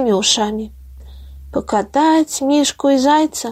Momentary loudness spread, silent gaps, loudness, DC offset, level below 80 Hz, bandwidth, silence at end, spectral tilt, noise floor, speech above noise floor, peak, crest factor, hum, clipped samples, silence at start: 12 LU; none; -15 LUFS; under 0.1%; -40 dBFS; 15 kHz; 0 s; -3 dB/octave; -36 dBFS; 21 dB; -2 dBFS; 16 dB; none; under 0.1%; 0 s